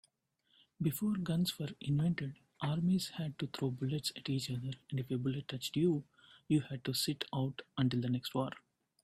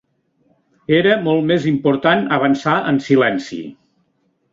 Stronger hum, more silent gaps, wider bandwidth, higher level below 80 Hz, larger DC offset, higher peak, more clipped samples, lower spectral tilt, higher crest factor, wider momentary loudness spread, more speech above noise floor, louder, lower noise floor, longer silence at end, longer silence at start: neither; neither; first, 15.5 kHz vs 7.6 kHz; second, -70 dBFS vs -58 dBFS; neither; second, -18 dBFS vs -2 dBFS; neither; about the same, -6 dB/octave vs -6.5 dB/octave; about the same, 18 dB vs 16 dB; second, 7 LU vs 14 LU; second, 42 dB vs 49 dB; second, -37 LUFS vs -16 LUFS; first, -77 dBFS vs -64 dBFS; second, 0.45 s vs 0.8 s; about the same, 0.8 s vs 0.9 s